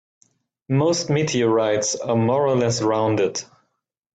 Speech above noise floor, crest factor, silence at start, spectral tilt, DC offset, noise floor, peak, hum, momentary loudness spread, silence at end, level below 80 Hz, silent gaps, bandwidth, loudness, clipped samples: 52 dB; 14 dB; 0.7 s; -5 dB/octave; under 0.1%; -71 dBFS; -8 dBFS; none; 4 LU; 0.7 s; -62 dBFS; none; 9.2 kHz; -20 LUFS; under 0.1%